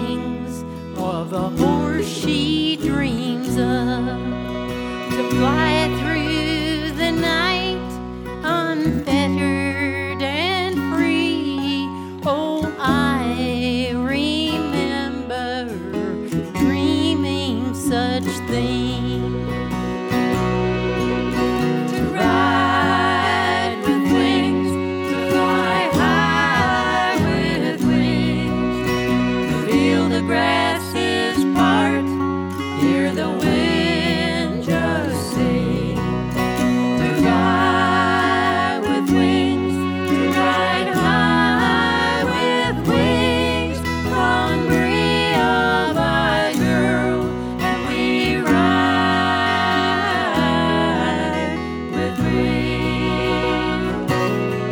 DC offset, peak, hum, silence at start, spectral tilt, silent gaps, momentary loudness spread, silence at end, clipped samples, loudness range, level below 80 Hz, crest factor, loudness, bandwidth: under 0.1%; -4 dBFS; none; 0 s; -5.5 dB/octave; none; 7 LU; 0 s; under 0.1%; 4 LU; -38 dBFS; 16 dB; -19 LUFS; over 20 kHz